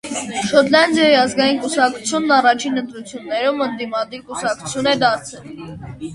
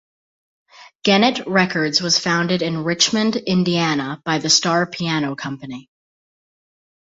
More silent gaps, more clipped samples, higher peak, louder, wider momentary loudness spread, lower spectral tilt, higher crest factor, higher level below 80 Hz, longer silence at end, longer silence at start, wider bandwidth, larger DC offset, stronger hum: second, none vs 0.95-0.99 s; neither; about the same, 0 dBFS vs -2 dBFS; about the same, -17 LUFS vs -18 LUFS; first, 18 LU vs 10 LU; about the same, -3 dB/octave vs -3.5 dB/octave; about the same, 18 dB vs 18 dB; first, -54 dBFS vs -60 dBFS; second, 0 s vs 1.35 s; second, 0.05 s vs 0.8 s; first, 11.5 kHz vs 8 kHz; neither; neither